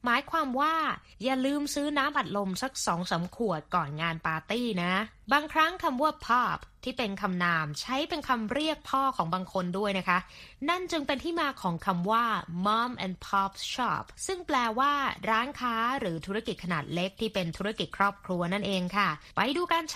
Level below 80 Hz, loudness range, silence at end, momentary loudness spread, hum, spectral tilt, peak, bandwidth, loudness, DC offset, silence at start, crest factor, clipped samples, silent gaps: -58 dBFS; 2 LU; 0 s; 6 LU; none; -4.5 dB/octave; -8 dBFS; 15 kHz; -29 LUFS; under 0.1%; 0.05 s; 20 dB; under 0.1%; none